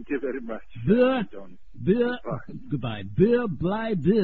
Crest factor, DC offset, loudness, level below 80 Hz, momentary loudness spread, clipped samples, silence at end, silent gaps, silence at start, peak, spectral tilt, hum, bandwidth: 18 dB; 1%; -25 LUFS; -50 dBFS; 14 LU; under 0.1%; 0 s; none; 0 s; -8 dBFS; -10 dB/octave; none; 4.5 kHz